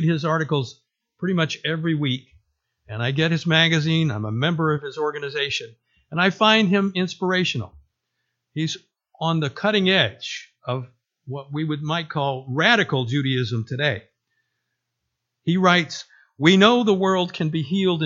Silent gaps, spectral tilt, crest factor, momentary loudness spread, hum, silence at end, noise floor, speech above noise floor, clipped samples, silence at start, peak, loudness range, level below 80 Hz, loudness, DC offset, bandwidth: none; -5.5 dB/octave; 22 dB; 14 LU; none; 0 s; -79 dBFS; 58 dB; under 0.1%; 0 s; 0 dBFS; 4 LU; -62 dBFS; -21 LUFS; under 0.1%; 7.6 kHz